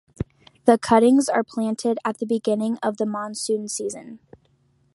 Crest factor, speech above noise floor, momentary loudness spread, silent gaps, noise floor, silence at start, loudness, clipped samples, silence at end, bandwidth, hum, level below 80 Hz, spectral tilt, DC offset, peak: 20 dB; 41 dB; 15 LU; none; -63 dBFS; 0.2 s; -22 LUFS; under 0.1%; 0.8 s; 11.5 kHz; none; -54 dBFS; -5 dB/octave; under 0.1%; -2 dBFS